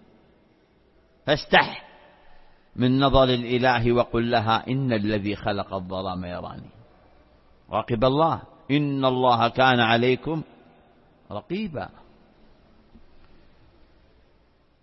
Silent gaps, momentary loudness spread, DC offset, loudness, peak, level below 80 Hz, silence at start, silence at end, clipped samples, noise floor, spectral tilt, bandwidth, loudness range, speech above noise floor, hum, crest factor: none; 17 LU; under 0.1%; -23 LUFS; -2 dBFS; -44 dBFS; 1.25 s; 2.95 s; under 0.1%; -60 dBFS; -8 dB/octave; 6 kHz; 16 LU; 38 dB; none; 24 dB